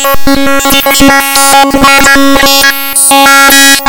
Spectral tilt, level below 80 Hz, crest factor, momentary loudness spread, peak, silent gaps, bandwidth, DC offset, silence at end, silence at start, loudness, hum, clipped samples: -1.5 dB/octave; -24 dBFS; 4 dB; 6 LU; 0 dBFS; none; over 20 kHz; under 0.1%; 0 s; 0 s; -3 LUFS; none; 9%